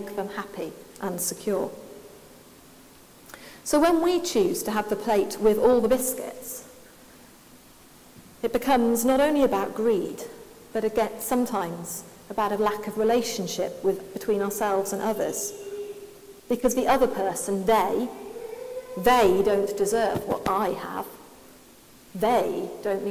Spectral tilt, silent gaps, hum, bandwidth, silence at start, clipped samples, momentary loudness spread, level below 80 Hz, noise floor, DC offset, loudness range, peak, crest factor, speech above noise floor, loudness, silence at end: -4 dB/octave; none; none; 16 kHz; 0 s; under 0.1%; 16 LU; -54 dBFS; -51 dBFS; under 0.1%; 5 LU; -8 dBFS; 18 dB; 27 dB; -25 LUFS; 0 s